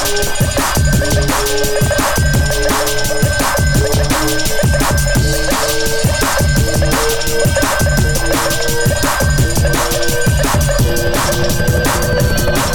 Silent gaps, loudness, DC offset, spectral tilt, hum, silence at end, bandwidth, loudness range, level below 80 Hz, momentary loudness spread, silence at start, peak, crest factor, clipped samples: none; -14 LUFS; under 0.1%; -4 dB/octave; none; 0 s; over 20 kHz; 0 LU; -20 dBFS; 2 LU; 0 s; -2 dBFS; 10 dB; under 0.1%